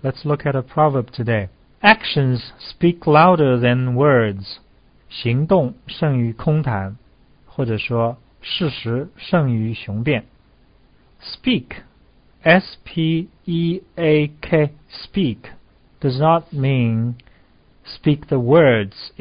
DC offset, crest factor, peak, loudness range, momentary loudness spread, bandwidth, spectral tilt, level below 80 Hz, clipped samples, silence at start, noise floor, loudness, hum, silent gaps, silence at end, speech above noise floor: under 0.1%; 18 dB; 0 dBFS; 7 LU; 16 LU; 5.2 kHz; -10.5 dB/octave; -48 dBFS; under 0.1%; 0.05 s; -53 dBFS; -18 LUFS; none; none; 0.15 s; 35 dB